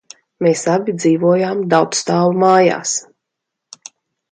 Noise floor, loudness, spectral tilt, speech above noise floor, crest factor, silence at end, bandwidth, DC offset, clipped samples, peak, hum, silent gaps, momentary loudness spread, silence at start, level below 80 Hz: -79 dBFS; -15 LUFS; -5 dB/octave; 65 dB; 16 dB; 1.3 s; 9.6 kHz; under 0.1%; under 0.1%; 0 dBFS; none; none; 7 LU; 0.4 s; -64 dBFS